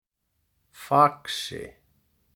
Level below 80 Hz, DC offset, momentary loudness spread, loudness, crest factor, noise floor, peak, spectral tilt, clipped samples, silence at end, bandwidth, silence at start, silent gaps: -64 dBFS; under 0.1%; 24 LU; -24 LUFS; 24 dB; -76 dBFS; -4 dBFS; -4.5 dB/octave; under 0.1%; 0.65 s; 19 kHz; 0.8 s; none